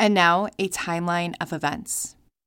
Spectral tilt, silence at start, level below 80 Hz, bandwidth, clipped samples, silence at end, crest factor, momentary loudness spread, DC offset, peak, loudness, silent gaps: -3.5 dB/octave; 0 s; -58 dBFS; 17 kHz; under 0.1%; 0.35 s; 20 dB; 10 LU; under 0.1%; -4 dBFS; -24 LUFS; none